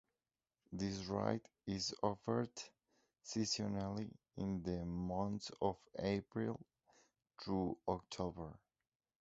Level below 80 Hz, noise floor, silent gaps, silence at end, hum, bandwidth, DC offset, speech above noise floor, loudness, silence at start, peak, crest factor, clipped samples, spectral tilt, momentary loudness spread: -64 dBFS; under -90 dBFS; none; 0.65 s; none; 7.6 kHz; under 0.1%; over 48 dB; -43 LUFS; 0.7 s; -20 dBFS; 22 dB; under 0.1%; -5.5 dB/octave; 12 LU